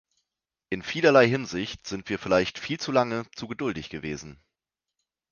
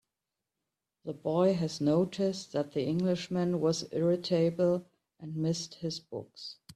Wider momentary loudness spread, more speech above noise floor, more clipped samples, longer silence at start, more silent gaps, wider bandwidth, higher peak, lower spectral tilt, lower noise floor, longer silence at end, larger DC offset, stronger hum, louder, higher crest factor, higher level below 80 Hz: about the same, 16 LU vs 15 LU; first, 62 dB vs 58 dB; neither; second, 0.7 s vs 1.05 s; neither; second, 7.2 kHz vs 12 kHz; first, -4 dBFS vs -16 dBFS; second, -5 dB/octave vs -6.5 dB/octave; about the same, -87 dBFS vs -88 dBFS; first, 1 s vs 0.05 s; neither; neither; first, -26 LUFS vs -31 LUFS; first, 24 dB vs 16 dB; first, -58 dBFS vs -70 dBFS